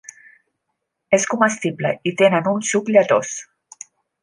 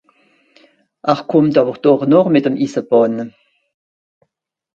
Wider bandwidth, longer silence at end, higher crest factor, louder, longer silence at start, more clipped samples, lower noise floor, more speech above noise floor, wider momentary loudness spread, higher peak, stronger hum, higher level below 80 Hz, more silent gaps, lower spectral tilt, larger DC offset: first, 11.5 kHz vs 7.6 kHz; second, 0.8 s vs 1.5 s; about the same, 18 dB vs 16 dB; second, -18 LUFS vs -15 LUFS; about the same, 1.1 s vs 1.05 s; neither; first, -77 dBFS vs -72 dBFS; about the same, 59 dB vs 59 dB; first, 18 LU vs 10 LU; about the same, -2 dBFS vs 0 dBFS; neither; second, -68 dBFS vs -62 dBFS; neither; second, -4 dB/octave vs -8 dB/octave; neither